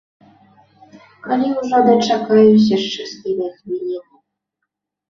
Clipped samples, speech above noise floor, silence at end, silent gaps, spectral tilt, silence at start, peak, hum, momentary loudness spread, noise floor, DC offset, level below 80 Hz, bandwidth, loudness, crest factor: under 0.1%; 63 dB; 1.1 s; none; -6 dB/octave; 1.25 s; -2 dBFS; none; 15 LU; -78 dBFS; under 0.1%; -60 dBFS; 7.2 kHz; -16 LUFS; 16 dB